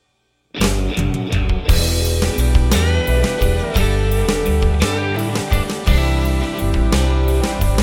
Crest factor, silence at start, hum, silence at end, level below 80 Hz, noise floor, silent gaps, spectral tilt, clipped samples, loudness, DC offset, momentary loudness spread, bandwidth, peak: 16 dB; 0.55 s; none; 0 s; -18 dBFS; -65 dBFS; none; -5 dB/octave; under 0.1%; -18 LUFS; under 0.1%; 4 LU; 17.5 kHz; 0 dBFS